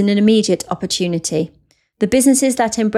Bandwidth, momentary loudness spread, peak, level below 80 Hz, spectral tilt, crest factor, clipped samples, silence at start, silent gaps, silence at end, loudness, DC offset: 15 kHz; 9 LU; -4 dBFS; -50 dBFS; -4.5 dB/octave; 12 dB; under 0.1%; 0 s; none; 0 s; -16 LUFS; under 0.1%